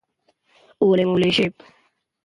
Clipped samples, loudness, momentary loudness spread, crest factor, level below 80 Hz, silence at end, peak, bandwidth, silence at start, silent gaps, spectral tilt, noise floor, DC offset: under 0.1%; -19 LUFS; 4 LU; 16 dB; -58 dBFS; 0.75 s; -6 dBFS; 11 kHz; 0.8 s; none; -6.5 dB/octave; -66 dBFS; under 0.1%